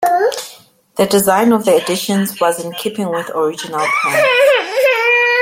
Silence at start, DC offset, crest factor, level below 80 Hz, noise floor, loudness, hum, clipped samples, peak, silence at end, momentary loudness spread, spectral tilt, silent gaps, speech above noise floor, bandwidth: 0 s; under 0.1%; 12 dB; -58 dBFS; -42 dBFS; -14 LUFS; none; under 0.1%; -2 dBFS; 0 s; 10 LU; -3.5 dB/octave; none; 28 dB; 16.5 kHz